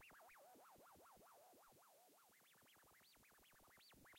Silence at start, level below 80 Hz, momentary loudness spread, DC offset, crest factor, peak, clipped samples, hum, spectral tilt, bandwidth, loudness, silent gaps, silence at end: 0 s; -88 dBFS; 4 LU; under 0.1%; 12 dB; -58 dBFS; under 0.1%; none; -2 dB/octave; 16.5 kHz; -68 LUFS; none; 0 s